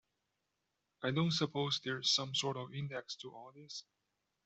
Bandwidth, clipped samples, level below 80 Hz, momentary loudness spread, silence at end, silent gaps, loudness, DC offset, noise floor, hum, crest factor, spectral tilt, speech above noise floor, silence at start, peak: 8.2 kHz; under 0.1%; -78 dBFS; 16 LU; 0.65 s; none; -36 LUFS; under 0.1%; -86 dBFS; none; 20 dB; -4 dB/octave; 48 dB; 1 s; -20 dBFS